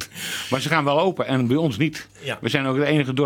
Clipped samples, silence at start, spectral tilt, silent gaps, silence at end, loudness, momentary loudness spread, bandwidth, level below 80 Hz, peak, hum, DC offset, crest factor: under 0.1%; 0 s; -5.5 dB/octave; none; 0 s; -22 LUFS; 8 LU; 18.5 kHz; -62 dBFS; -4 dBFS; none; under 0.1%; 18 dB